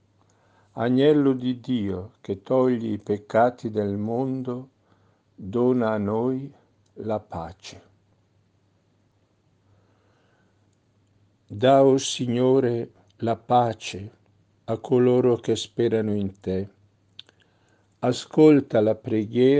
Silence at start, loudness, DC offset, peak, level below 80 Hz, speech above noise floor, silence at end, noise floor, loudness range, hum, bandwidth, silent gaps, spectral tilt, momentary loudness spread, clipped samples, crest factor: 0.75 s; -23 LUFS; under 0.1%; -4 dBFS; -68 dBFS; 43 dB; 0 s; -65 dBFS; 9 LU; none; 9.4 kHz; none; -6.5 dB/octave; 18 LU; under 0.1%; 20 dB